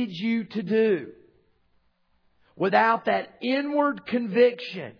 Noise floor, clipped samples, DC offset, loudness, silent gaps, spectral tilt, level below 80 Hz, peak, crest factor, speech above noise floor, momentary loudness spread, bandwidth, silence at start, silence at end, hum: -67 dBFS; under 0.1%; under 0.1%; -24 LUFS; none; -7.5 dB/octave; -72 dBFS; -6 dBFS; 20 dB; 42 dB; 8 LU; 5.4 kHz; 0 s; 0.1 s; none